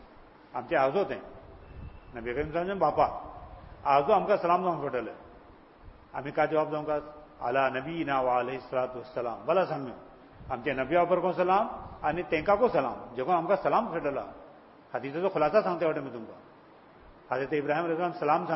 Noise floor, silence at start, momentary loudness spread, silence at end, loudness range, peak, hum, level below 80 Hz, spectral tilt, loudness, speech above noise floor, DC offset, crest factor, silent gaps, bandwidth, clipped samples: -55 dBFS; 0 s; 17 LU; 0 s; 4 LU; -10 dBFS; none; -56 dBFS; -10 dB/octave; -29 LUFS; 26 dB; under 0.1%; 20 dB; none; 5.8 kHz; under 0.1%